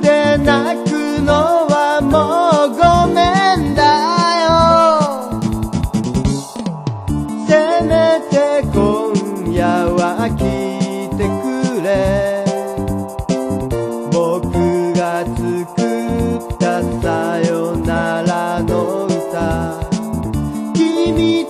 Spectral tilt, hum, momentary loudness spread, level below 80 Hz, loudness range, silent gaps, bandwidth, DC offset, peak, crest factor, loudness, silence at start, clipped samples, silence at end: -6 dB/octave; none; 8 LU; -32 dBFS; 6 LU; none; 15 kHz; under 0.1%; 0 dBFS; 14 dB; -15 LUFS; 0 s; under 0.1%; 0 s